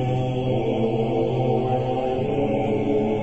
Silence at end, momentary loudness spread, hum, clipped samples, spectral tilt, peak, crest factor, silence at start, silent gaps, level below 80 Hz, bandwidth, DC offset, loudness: 0 s; 2 LU; none; under 0.1%; -9 dB/octave; -10 dBFS; 12 dB; 0 s; none; -44 dBFS; 8 kHz; 0.9%; -23 LUFS